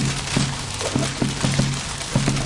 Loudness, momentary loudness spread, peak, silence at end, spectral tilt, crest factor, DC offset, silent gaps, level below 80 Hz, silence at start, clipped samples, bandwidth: -22 LUFS; 3 LU; -6 dBFS; 0 s; -4 dB/octave; 16 dB; under 0.1%; none; -38 dBFS; 0 s; under 0.1%; 11.5 kHz